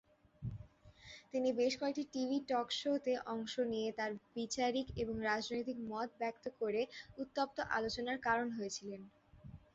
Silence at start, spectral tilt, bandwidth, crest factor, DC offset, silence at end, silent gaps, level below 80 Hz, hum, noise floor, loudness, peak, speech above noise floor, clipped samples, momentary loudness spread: 0.4 s; -3 dB/octave; 8 kHz; 20 dB; under 0.1%; 0.15 s; none; -64 dBFS; none; -60 dBFS; -39 LUFS; -20 dBFS; 21 dB; under 0.1%; 12 LU